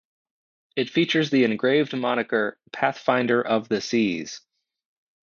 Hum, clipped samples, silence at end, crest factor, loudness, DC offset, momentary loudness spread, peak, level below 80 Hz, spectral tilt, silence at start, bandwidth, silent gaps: none; under 0.1%; 0.85 s; 18 dB; -23 LUFS; under 0.1%; 9 LU; -6 dBFS; -70 dBFS; -5 dB/octave; 0.75 s; 7.2 kHz; none